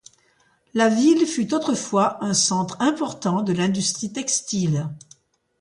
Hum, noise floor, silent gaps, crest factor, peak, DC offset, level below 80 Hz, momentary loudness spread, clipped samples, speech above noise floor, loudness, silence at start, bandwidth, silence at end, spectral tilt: none; -62 dBFS; none; 16 dB; -6 dBFS; under 0.1%; -64 dBFS; 8 LU; under 0.1%; 41 dB; -21 LUFS; 0.75 s; 11.5 kHz; 0.65 s; -4 dB/octave